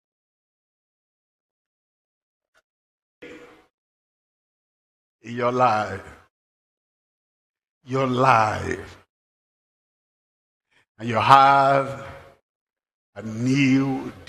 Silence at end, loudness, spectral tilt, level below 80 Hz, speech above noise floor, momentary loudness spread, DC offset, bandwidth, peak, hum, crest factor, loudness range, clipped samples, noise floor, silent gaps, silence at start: 0.15 s; -20 LUFS; -6 dB/octave; -62 dBFS; 25 dB; 21 LU; under 0.1%; 12.5 kHz; 0 dBFS; none; 26 dB; 8 LU; under 0.1%; -44 dBFS; 3.74-5.19 s, 6.30-7.54 s, 7.69-7.81 s, 9.09-10.60 s, 10.89-10.95 s, 12.42-12.67 s, 12.94-13.13 s; 3.2 s